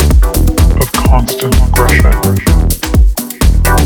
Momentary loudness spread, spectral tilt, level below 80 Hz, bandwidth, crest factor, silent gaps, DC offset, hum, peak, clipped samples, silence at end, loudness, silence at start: 3 LU; -5 dB/octave; -10 dBFS; over 20 kHz; 8 dB; none; under 0.1%; none; 0 dBFS; under 0.1%; 0 s; -11 LUFS; 0 s